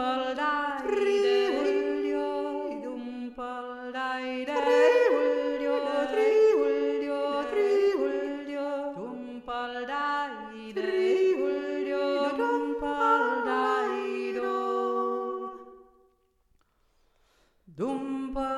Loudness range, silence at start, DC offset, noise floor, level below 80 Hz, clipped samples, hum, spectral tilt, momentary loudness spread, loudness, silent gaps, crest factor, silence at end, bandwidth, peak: 8 LU; 0 s; under 0.1%; -68 dBFS; -60 dBFS; under 0.1%; none; -4.5 dB/octave; 13 LU; -28 LUFS; none; 16 dB; 0 s; 11.5 kHz; -12 dBFS